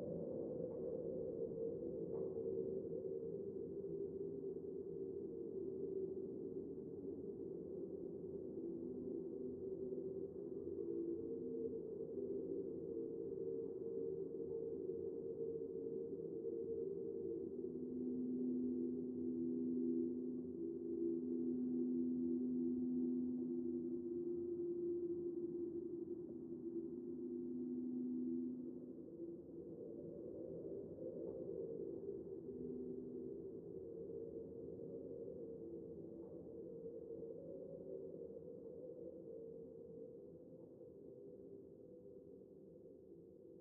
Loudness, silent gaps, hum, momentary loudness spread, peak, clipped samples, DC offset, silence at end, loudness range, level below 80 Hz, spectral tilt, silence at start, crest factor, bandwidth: -47 LUFS; none; none; 12 LU; -30 dBFS; under 0.1%; under 0.1%; 0 s; 10 LU; -78 dBFS; -8 dB/octave; 0 s; 16 dB; 1.5 kHz